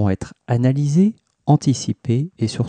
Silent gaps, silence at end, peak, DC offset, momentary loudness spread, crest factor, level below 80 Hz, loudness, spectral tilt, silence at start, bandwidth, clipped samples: none; 0 s; -4 dBFS; under 0.1%; 7 LU; 14 dB; -52 dBFS; -19 LUFS; -7 dB/octave; 0 s; 9.6 kHz; under 0.1%